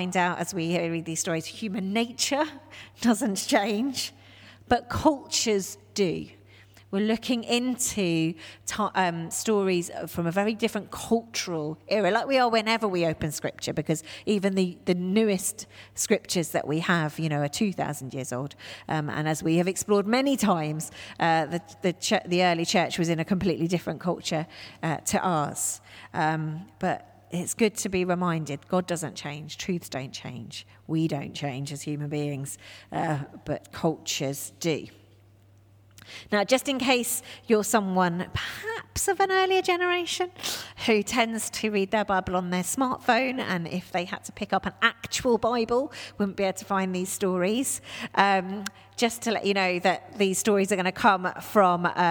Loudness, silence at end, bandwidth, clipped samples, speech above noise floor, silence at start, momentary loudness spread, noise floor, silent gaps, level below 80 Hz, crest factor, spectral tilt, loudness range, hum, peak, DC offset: -27 LUFS; 0 s; over 20 kHz; under 0.1%; 29 dB; 0 s; 11 LU; -56 dBFS; none; -58 dBFS; 22 dB; -4 dB/octave; 6 LU; none; -4 dBFS; under 0.1%